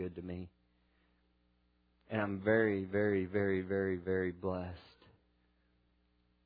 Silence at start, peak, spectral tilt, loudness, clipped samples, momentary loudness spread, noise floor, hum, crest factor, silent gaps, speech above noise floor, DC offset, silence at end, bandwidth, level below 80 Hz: 0 s; -18 dBFS; -6.5 dB/octave; -35 LUFS; under 0.1%; 16 LU; -74 dBFS; 60 Hz at -70 dBFS; 20 dB; none; 39 dB; under 0.1%; 1.65 s; 5 kHz; -68 dBFS